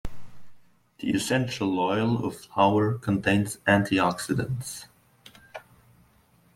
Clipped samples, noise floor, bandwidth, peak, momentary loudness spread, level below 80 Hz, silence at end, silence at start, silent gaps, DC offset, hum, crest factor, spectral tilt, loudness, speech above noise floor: under 0.1%; -61 dBFS; 16 kHz; -6 dBFS; 21 LU; -52 dBFS; 0.95 s; 0.05 s; none; under 0.1%; none; 20 dB; -5.5 dB/octave; -25 LUFS; 36 dB